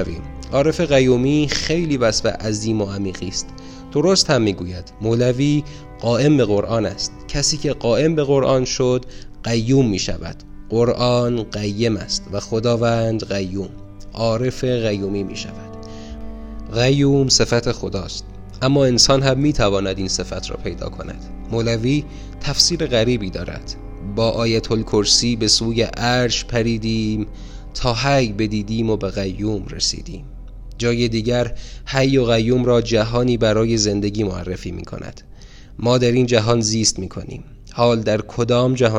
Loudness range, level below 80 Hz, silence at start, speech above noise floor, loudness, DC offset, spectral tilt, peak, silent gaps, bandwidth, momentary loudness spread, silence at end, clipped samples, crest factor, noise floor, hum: 4 LU; -34 dBFS; 0 s; 20 dB; -18 LUFS; under 0.1%; -4.5 dB/octave; -2 dBFS; none; 15.5 kHz; 17 LU; 0 s; under 0.1%; 18 dB; -39 dBFS; none